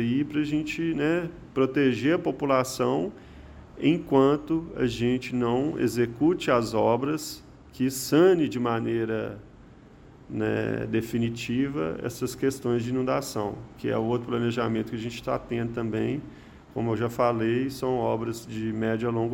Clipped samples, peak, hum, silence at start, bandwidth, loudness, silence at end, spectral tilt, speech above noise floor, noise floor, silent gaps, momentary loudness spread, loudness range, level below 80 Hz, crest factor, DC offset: under 0.1%; -8 dBFS; none; 0 s; 17 kHz; -27 LUFS; 0 s; -6 dB/octave; 24 dB; -50 dBFS; none; 9 LU; 5 LU; -54 dBFS; 18 dB; under 0.1%